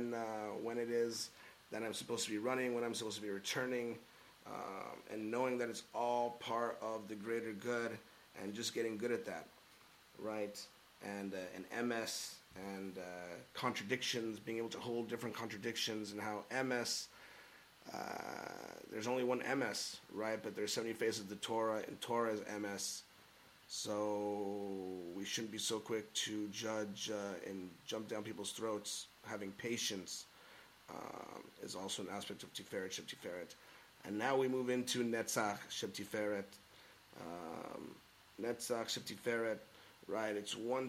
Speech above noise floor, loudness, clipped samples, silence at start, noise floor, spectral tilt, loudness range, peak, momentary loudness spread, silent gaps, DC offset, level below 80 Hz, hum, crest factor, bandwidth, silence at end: 23 dB; -42 LUFS; under 0.1%; 0 s; -65 dBFS; -3 dB/octave; 5 LU; -22 dBFS; 15 LU; none; under 0.1%; -82 dBFS; none; 20 dB; 16.5 kHz; 0 s